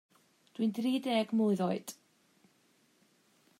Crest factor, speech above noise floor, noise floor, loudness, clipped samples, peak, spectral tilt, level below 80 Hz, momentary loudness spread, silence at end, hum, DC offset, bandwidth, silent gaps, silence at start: 16 dB; 38 dB; -70 dBFS; -32 LUFS; under 0.1%; -20 dBFS; -6 dB/octave; -86 dBFS; 19 LU; 1.65 s; none; under 0.1%; 16 kHz; none; 0.6 s